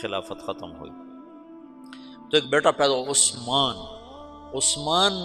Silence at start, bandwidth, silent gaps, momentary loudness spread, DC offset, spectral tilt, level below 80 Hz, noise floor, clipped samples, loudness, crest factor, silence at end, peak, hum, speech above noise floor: 0 s; 14.5 kHz; none; 24 LU; under 0.1%; -1.5 dB/octave; -56 dBFS; -45 dBFS; under 0.1%; -22 LUFS; 22 dB; 0 s; -4 dBFS; none; 21 dB